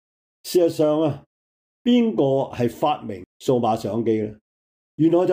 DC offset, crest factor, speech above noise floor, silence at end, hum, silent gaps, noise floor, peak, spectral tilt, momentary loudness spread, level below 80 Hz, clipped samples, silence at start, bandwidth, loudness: under 0.1%; 14 dB; over 70 dB; 0 s; none; 1.26-1.85 s, 3.26-3.40 s, 4.41-4.98 s; under -90 dBFS; -8 dBFS; -7 dB/octave; 10 LU; -62 dBFS; under 0.1%; 0.45 s; 16 kHz; -22 LUFS